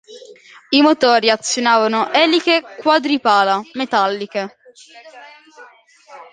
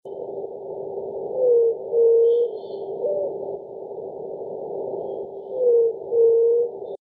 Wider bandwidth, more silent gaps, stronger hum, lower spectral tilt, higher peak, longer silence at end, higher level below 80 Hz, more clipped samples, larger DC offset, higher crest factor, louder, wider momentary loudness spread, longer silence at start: first, 9.8 kHz vs 3.6 kHz; neither; neither; second, -2.5 dB/octave vs -11 dB/octave; first, 0 dBFS vs -10 dBFS; about the same, 0.1 s vs 0.05 s; about the same, -68 dBFS vs -70 dBFS; neither; neither; about the same, 16 dB vs 12 dB; first, -15 LUFS vs -22 LUFS; second, 8 LU vs 16 LU; about the same, 0.1 s vs 0.05 s